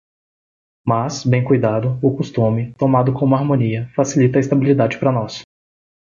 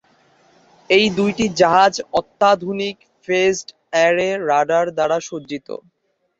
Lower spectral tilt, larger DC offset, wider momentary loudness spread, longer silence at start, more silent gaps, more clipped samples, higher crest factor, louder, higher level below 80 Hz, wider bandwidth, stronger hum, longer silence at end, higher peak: first, -7.5 dB/octave vs -4 dB/octave; neither; second, 5 LU vs 15 LU; about the same, 0.85 s vs 0.9 s; neither; neither; about the same, 16 dB vs 18 dB; about the same, -17 LUFS vs -17 LUFS; first, -52 dBFS vs -58 dBFS; about the same, 7.6 kHz vs 8 kHz; neither; about the same, 0.7 s vs 0.6 s; about the same, -2 dBFS vs -2 dBFS